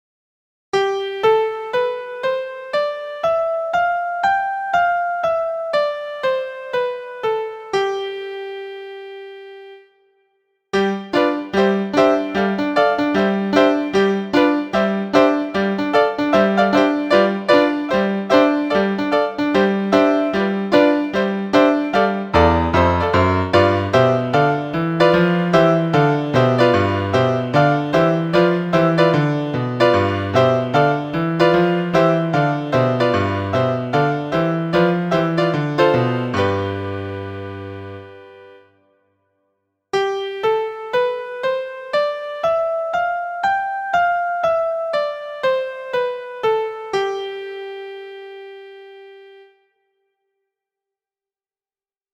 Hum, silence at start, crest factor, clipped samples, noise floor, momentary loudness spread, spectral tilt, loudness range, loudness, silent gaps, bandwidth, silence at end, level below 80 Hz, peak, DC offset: none; 0.75 s; 18 dB; under 0.1%; under -90 dBFS; 10 LU; -7 dB/octave; 10 LU; -18 LUFS; none; 16.5 kHz; 2.8 s; -46 dBFS; 0 dBFS; under 0.1%